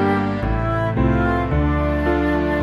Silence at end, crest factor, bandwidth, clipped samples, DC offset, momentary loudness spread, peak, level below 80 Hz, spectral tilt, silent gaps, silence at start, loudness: 0 s; 12 dB; 7 kHz; under 0.1%; under 0.1%; 3 LU; -6 dBFS; -26 dBFS; -9 dB/octave; none; 0 s; -20 LUFS